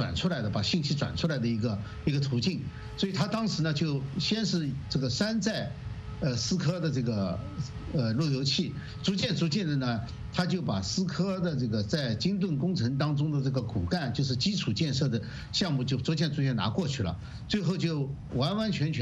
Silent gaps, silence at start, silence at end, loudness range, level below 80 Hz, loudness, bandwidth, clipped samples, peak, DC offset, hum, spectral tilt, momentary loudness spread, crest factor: none; 0 s; 0 s; 1 LU; -50 dBFS; -30 LUFS; 8.4 kHz; under 0.1%; -12 dBFS; under 0.1%; none; -5.5 dB/octave; 5 LU; 18 dB